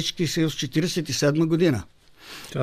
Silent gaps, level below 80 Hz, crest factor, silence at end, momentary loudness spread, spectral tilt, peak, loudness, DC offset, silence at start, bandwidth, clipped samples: none; -54 dBFS; 16 dB; 0 s; 13 LU; -5 dB/octave; -8 dBFS; -23 LUFS; under 0.1%; 0 s; 15.5 kHz; under 0.1%